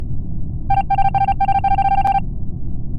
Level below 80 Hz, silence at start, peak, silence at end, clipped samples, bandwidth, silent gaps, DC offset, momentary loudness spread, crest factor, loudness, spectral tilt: -26 dBFS; 0 s; -4 dBFS; 0 s; under 0.1%; 5 kHz; none; under 0.1%; 12 LU; 12 dB; -19 LUFS; -8 dB/octave